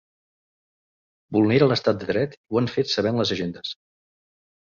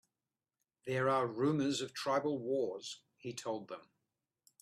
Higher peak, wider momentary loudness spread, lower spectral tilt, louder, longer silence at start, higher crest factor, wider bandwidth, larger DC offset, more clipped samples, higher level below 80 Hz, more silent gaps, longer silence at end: first, -6 dBFS vs -22 dBFS; about the same, 13 LU vs 15 LU; about the same, -6 dB/octave vs -5 dB/octave; first, -22 LUFS vs -36 LUFS; first, 1.3 s vs 0.85 s; about the same, 20 dB vs 16 dB; second, 7.4 kHz vs 14 kHz; neither; neither; first, -58 dBFS vs -80 dBFS; first, 2.37-2.44 s vs none; first, 1.05 s vs 0.8 s